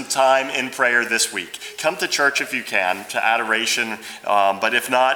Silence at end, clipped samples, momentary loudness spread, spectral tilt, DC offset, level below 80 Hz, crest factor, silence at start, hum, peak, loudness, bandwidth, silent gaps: 0 s; under 0.1%; 7 LU; -1 dB/octave; under 0.1%; -70 dBFS; 18 dB; 0 s; none; -2 dBFS; -19 LUFS; over 20 kHz; none